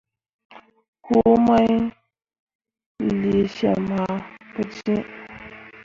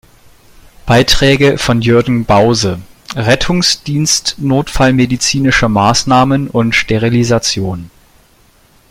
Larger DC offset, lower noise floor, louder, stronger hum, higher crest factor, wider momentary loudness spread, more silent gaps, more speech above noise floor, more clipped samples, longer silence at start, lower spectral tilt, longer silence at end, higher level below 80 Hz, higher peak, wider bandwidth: neither; second, -41 dBFS vs -48 dBFS; second, -21 LUFS vs -11 LUFS; neither; first, 18 dB vs 12 dB; first, 21 LU vs 8 LU; first, 0.88-0.93 s, 2.39-2.47 s, 2.55-2.59 s, 2.86-2.95 s vs none; second, 22 dB vs 37 dB; neither; second, 0.55 s vs 0.85 s; first, -8 dB/octave vs -4.5 dB/octave; second, 0.15 s vs 1.05 s; second, -52 dBFS vs -30 dBFS; second, -4 dBFS vs 0 dBFS; second, 7.2 kHz vs 16.5 kHz